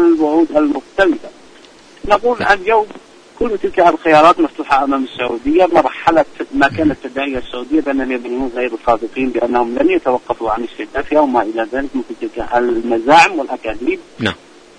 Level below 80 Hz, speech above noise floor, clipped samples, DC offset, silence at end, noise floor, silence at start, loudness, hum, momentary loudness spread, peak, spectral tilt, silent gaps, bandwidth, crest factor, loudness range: -40 dBFS; 27 dB; under 0.1%; under 0.1%; 0.45 s; -42 dBFS; 0 s; -15 LUFS; none; 11 LU; 0 dBFS; -5 dB/octave; none; 10.5 kHz; 14 dB; 4 LU